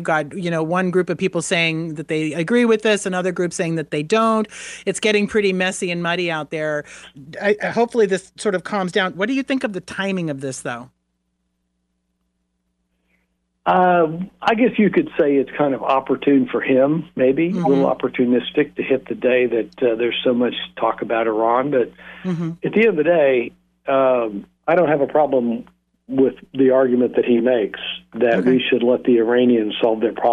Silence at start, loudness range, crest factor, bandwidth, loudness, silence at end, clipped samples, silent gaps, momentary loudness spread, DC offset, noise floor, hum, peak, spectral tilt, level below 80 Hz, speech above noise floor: 0 s; 6 LU; 14 dB; 11.5 kHz; -19 LUFS; 0 s; under 0.1%; none; 9 LU; under 0.1%; -71 dBFS; 60 Hz at -50 dBFS; -4 dBFS; -5.5 dB/octave; -60 dBFS; 53 dB